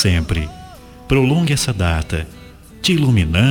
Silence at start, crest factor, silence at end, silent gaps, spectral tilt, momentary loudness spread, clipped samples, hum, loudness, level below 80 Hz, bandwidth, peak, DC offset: 0 s; 16 dB; 0 s; none; -5.5 dB/octave; 12 LU; under 0.1%; none; -17 LUFS; -32 dBFS; 19 kHz; 0 dBFS; under 0.1%